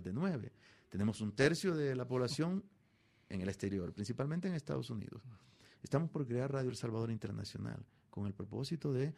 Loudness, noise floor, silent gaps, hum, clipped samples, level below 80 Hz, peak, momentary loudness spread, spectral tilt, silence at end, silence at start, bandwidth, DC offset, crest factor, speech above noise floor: -39 LUFS; -71 dBFS; none; none; under 0.1%; -68 dBFS; -18 dBFS; 11 LU; -6.5 dB/octave; 0 s; 0 s; 14 kHz; under 0.1%; 22 dB; 33 dB